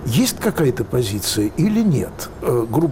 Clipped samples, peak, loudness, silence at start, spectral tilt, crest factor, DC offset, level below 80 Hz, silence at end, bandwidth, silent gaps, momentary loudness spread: under 0.1%; -6 dBFS; -19 LUFS; 0 s; -5.5 dB/octave; 12 dB; under 0.1%; -40 dBFS; 0 s; 17 kHz; none; 4 LU